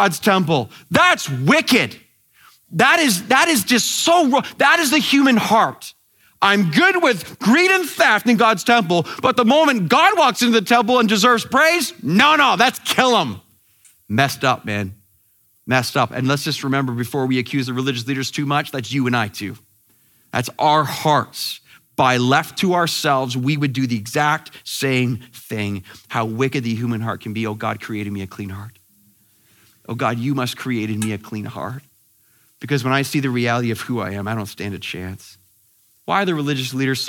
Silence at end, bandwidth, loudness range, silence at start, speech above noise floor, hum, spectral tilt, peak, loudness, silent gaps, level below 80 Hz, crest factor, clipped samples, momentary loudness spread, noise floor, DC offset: 0 s; 18.5 kHz; 10 LU; 0 s; 41 dB; none; -4 dB/octave; 0 dBFS; -17 LUFS; none; -62 dBFS; 18 dB; under 0.1%; 14 LU; -59 dBFS; under 0.1%